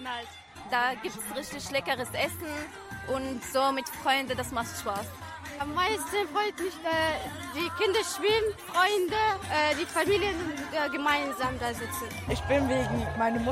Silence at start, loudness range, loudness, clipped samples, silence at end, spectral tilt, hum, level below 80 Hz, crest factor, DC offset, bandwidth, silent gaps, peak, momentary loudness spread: 0 s; 4 LU; -29 LUFS; under 0.1%; 0 s; -3.5 dB/octave; none; -50 dBFS; 18 dB; under 0.1%; 16 kHz; none; -12 dBFS; 10 LU